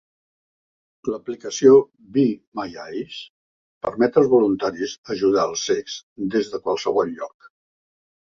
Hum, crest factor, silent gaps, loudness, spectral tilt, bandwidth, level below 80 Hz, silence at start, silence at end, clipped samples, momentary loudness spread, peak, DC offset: none; 20 dB; 2.47-2.52 s, 3.30-3.81 s, 4.98-5.03 s, 6.03-6.16 s; -21 LUFS; -5 dB/octave; 7.4 kHz; -60 dBFS; 1.05 s; 1 s; under 0.1%; 16 LU; -2 dBFS; under 0.1%